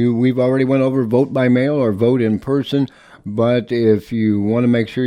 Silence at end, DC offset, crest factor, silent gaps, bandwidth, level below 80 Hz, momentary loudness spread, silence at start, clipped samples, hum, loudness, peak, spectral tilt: 0 s; under 0.1%; 14 dB; none; 9.8 kHz; -54 dBFS; 4 LU; 0 s; under 0.1%; none; -16 LUFS; -2 dBFS; -8.5 dB/octave